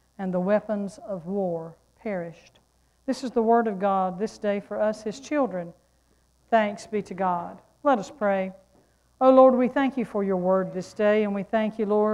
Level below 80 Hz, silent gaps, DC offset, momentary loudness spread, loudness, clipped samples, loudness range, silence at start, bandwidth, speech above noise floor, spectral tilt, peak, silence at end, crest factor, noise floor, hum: -64 dBFS; none; under 0.1%; 12 LU; -25 LUFS; under 0.1%; 6 LU; 0.2 s; 11 kHz; 40 dB; -7 dB/octave; -4 dBFS; 0 s; 20 dB; -64 dBFS; none